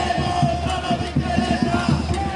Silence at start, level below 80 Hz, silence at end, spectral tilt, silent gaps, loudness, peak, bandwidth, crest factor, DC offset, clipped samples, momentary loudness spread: 0 s; -34 dBFS; 0 s; -6 dB/octave; none; -21 LUFS; -6 dBFS; 11.5 kHz; 16 dB; under 0.1%; under 0.1%; 3 LU